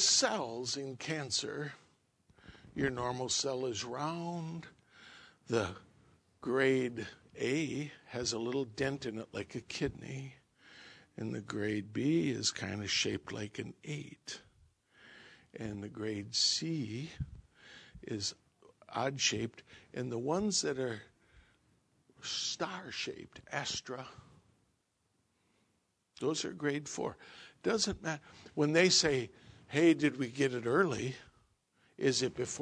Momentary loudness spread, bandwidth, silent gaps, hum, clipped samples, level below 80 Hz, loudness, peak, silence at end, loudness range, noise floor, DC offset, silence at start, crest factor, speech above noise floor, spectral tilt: 17 LU; 10.5 kHz; none; none; under 0.1%; -66 dBFS; -35 LUFS; -12 dBFS; 0 s; 10 LU; -78 dBFS; under 0.1%; 0 s; 24 dB; 43 dB; -3.5 dB/octave